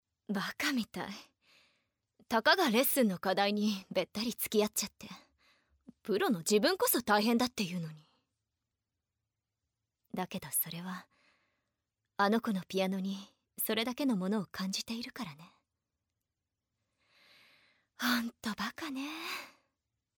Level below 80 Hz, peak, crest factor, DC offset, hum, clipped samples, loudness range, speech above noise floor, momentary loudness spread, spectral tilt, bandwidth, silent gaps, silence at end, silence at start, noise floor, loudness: -74 dBFS; -12 dBFS; 24 dB; under 0.1%; none; under 0.1%; 10 LU; 56 dB; 17 LU; -3.5 dB/octave; over 20 kHz; none; 0.7 s; 0.3 s; -89 dBFS; -33 LUFS